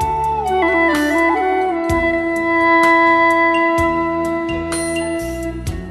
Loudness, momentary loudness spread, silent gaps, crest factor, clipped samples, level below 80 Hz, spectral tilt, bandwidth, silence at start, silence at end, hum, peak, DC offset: -15 LUFS; 10 LU; none; 14 dB; under 0.1%; -36 dBFS; -5 dB/octave; 13 kHz; 0 s; 0 s; none; -2 dBFS; under 0.1%